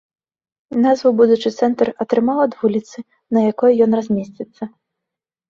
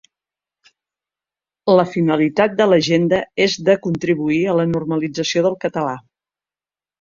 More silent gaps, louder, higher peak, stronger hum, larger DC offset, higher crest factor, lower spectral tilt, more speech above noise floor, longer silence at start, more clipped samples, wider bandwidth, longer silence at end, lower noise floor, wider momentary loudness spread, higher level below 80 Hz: neither; about the same, -17 LUFS vs -17 LUFS; about the same, -2 dBFS vs 0 dBFS; neither; neither; about the same, 16 dB vs 18 dB; first, -7 dB/octave vs -5.5 dB/octave; second, 68 dB vs over 73 dB; second, 0.7 s vs 1.65 s; neither; about the same, 7.4 kHz vs 7.6 kHz; second, 0.8 s vs 1 s; second, -84 dBFS vs under -90 dBFS; first, 17 LU vs 7 LU; about the same, -60 dBFS vs -58 dBFS